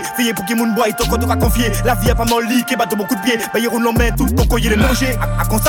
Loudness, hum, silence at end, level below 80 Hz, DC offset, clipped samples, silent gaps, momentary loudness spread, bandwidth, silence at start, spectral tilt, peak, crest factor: -16 LUFS; none; 0 s; -22 dBFS; under 0.1%; under 0.1%; none; 3 LU; 19.5 kHz; 0 s; -5 dB/octave; 0 dBFS; 14 dB